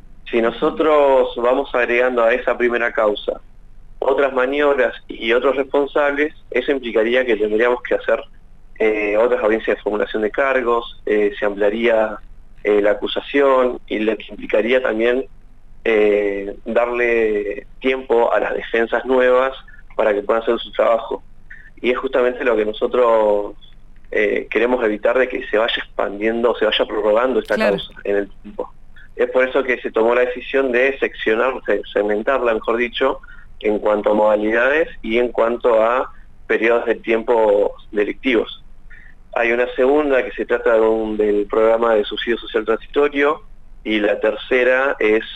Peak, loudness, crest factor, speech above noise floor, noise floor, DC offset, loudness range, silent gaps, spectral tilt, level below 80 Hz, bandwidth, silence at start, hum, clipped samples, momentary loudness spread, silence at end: -2 dBFS; -18 LUFS; 16 dB; 21 dB; -38 dBFS; under 0.1%; 2 LU; none; -5.5 dB/octave; -42 dBFS; 8 kHz; 0.05 s; none; under 0.1%; 7 LU; 0 s